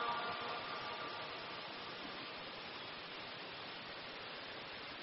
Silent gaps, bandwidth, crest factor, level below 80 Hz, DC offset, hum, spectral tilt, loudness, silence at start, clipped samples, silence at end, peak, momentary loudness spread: none; 5.8 kHz; 18 dB; -76 dBFS; under 0.1%; none; -0.5 dB/octave; -45 LUFS; 0 s; under 0.1%; 0 s; -28 dBFS; 5 LU